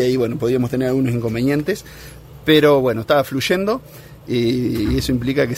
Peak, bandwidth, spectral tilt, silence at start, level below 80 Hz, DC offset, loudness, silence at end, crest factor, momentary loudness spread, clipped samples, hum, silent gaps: 0 dBFS; 16 kHz; -6 dB/octave; 0 s; -38 dBFS; under 0.1%; -18 LUFS; 0 s; 18 dB; 12 LU; under 0.1%; none; none